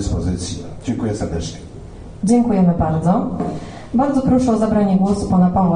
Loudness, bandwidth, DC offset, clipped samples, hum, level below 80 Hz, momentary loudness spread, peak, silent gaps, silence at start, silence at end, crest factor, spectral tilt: -18 LUFS; 10 kHz; under 0.1%; under 0.1%; none; -34 dBFS; 14 LU; -4 dBFS; none; 0 s; 0 s; 14 dB; -7.5 dB/octave